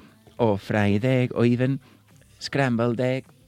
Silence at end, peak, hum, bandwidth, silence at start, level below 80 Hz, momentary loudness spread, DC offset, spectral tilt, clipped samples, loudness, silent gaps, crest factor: 0.25 s; -6 dBFS; none; 12 kHz; 0.4 s; -60 dBFS; 6 LU; under 0.1%; -7.5 dB/octave; under 0.1%; -23 LUFS; none; 18 dB